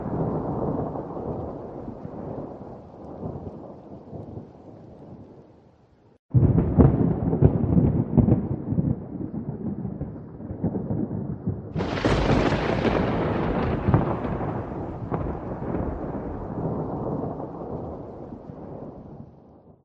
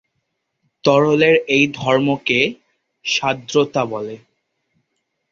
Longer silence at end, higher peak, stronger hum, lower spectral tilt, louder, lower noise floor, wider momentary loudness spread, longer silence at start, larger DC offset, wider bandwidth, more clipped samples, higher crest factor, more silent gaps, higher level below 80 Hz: second, 0.15 s vs 1.15 s; about the same, -2 dBFS vs -2 dBFS; neither; first, -9 dB/octave vs -4.5 dB/octave; second, -26 LUFS vs -17 LUFS; second, -56 dBFS vs -73 dBFS; first, 20 LU vs 10 LU; second, 0 s vs 0.85 s; neither; about the same, 8 kHz vs 7.6 kHz; neither; first, 24 dB vs 18 dB; first, 6.19-6.29 s vs none; first, -38 dBFS vs -60 dBFS